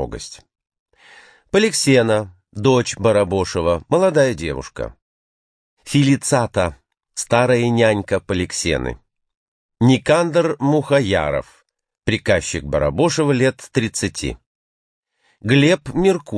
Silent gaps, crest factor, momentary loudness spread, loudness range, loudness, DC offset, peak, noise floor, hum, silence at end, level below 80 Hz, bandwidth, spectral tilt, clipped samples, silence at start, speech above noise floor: 0.79-0.86 s, 5.02-5.77 s, 9.37-9.69 s, 14.46-15.03 s; 18 dB; 13 LU; 3 LU; -18 LUFS; under 0.1%; 0 dBFS; -47 dBFS; none; 0 s; -42 dBFS; 11 kHz; -5 dB/octave; under 0.1%; 0 s; 30 dB